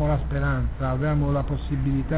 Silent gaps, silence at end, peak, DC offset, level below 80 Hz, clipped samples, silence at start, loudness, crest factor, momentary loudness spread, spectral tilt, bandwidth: none; 0 s; -12 dBFS; 0.5%; -30 dBFS; under 0.1%; 0 s; -25 LUFS; 12 dB; 3 LU; -12 dB/octave; 4 kHz